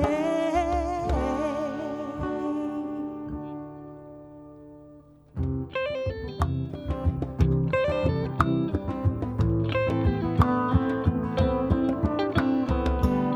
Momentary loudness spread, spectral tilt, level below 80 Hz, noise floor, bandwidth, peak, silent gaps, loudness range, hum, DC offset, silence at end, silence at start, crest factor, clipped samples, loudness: 13 LU; -8.5 dB/octave; -36 dBFS; -51 dBFS; 12.5 kHz; -2 dBFS; none; 10 LU; none; under 0.1%; 0 s; 0 s; 24 dB; under 0.1%; -27 LUFS